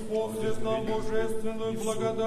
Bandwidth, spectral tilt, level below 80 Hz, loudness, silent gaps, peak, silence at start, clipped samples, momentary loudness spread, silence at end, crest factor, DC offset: 13.5 kHz; -5.5 dB/octave; -44 dBFS; -31 LUFS; none; -14 dBFS; 0 s; under 0.1%; 3 LU; 0 s; 12 dB; under 0.1%